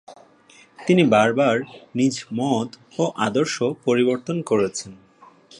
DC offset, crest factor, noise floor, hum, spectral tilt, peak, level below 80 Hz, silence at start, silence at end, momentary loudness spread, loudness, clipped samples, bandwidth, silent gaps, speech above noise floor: under 0.1%; 18 dB; -52 dBFS; none; -5.5 dB/octave; -4 dBFS; -64 dBFS; 0.1 s; 0.65 s; 13 LU; -21 LUFS; under 0.1%; 11 kHz; none; 31 dB